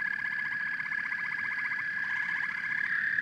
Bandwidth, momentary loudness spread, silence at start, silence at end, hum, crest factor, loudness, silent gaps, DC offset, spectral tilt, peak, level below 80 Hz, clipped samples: 12 kHz; 3 LU; 0 s; 0 s; none; 16 dB; -31 LUFS; none; under 0.1%; -2.5 dB/octave; -16 dBFS; -80 dBFS; under 0.1%